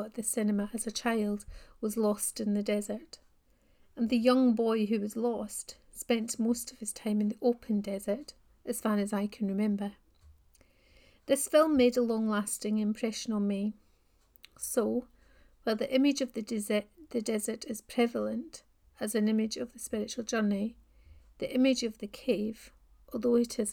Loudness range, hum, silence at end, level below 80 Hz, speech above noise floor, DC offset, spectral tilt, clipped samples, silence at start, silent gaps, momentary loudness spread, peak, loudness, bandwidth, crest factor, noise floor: 4 LU; none; 0 s; -62 dBFS; 36 dB; under 0.1%; -4.5 dB/octave; under 0.1%; 0 s; none; 13 LU; -12 dBFS; -31 LUFS; 18 kHz; 20 dB; -67 dBFS